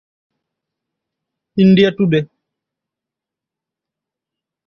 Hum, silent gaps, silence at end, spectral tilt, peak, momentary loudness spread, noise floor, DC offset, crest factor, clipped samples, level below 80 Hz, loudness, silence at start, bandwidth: none; none; 2.4 s; -8.5 dB/octave; -2 dBFS; 15 LU; -85 dBFS; under 0.1%; 18 dB; under 0.1%; -56 dBFS; -13 LUFS; 1.55 s; 6.2 kHz